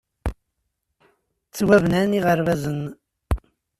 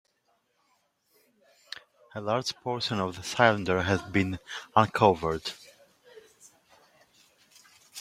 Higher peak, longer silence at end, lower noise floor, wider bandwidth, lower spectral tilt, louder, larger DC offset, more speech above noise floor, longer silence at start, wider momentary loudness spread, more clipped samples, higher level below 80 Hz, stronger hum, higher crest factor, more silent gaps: about the same, -4 dBFS vs -4 dBFS; first, 0.4 s vs 0 s; about the same, -76 dBFS vs -73 dBFS; about the same, 14.5 kHz vs 15.5 kHz; first, -6.5 dB/octave vs -5 dB/octave; first, -21 LUFS vs -27 LUFS; neither; first, 57 dB vs 46 dB; second, 0.25 s vs 2.15 s; second, 16 LU vs 21 LU; neither; first, -36 dBFS vs -60 dBFS; neither; second, 20 dB vs 26 dB; neither